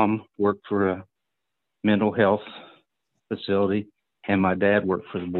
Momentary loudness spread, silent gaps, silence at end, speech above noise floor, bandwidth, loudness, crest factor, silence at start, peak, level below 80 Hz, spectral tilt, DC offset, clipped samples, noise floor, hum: 14 LU; none; 0 s; 60 dB; 4.3 kHz; -24 LUFS; 20 dB; 0 s; -6 dBFS; -54 dBFS; -10.5 dB/octave; under 0.1%; under 0.1%; -84 dBFS; none